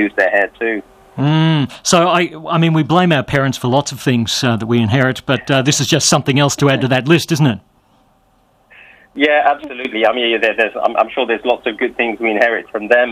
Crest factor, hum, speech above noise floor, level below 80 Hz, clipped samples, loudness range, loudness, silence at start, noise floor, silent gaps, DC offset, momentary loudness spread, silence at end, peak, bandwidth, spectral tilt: 14 dB; none; 41 dB; -50 dBFS; under 0.1%; 3 LU; -14 LUFS; 0 s; -55 dBFS; none; under 0.1%; 6 LU; 0 s; 0 dBFS; 15.5 kHz; -4.5 dB/octave